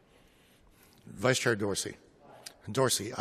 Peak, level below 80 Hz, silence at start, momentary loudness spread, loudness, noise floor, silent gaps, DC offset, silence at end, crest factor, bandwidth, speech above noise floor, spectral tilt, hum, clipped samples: -10 dBFS; -68 dBFS; 1.05 s; 21 LU; -30 LUFS; -62 dBFS; none; under 0.1%; 0 s; 24 dB; 14 kHz; 32 dB; -3.5 dB/octave; none; under 0.1%